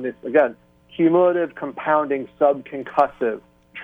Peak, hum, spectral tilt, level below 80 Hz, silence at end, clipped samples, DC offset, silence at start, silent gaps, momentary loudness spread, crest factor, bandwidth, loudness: -4 dBFS; none; -8.5 dB/octave; -62 dBFS; 0 s; under 0.1%; under 0.1%; 0 s; none; 11 LU; 18 dB; 4.7 kHz; -21 LUFS